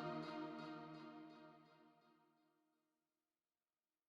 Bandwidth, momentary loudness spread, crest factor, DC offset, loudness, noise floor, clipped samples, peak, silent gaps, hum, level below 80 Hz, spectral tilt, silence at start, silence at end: 10 kHz; 16 LU; 20 dB; under 0.1%; -53 LUFS; under -90 dBFS; under 0.1%; -36 dBFS; none; none; under -90 dBFS; -7 dB/octave; 0 s; 1.85 s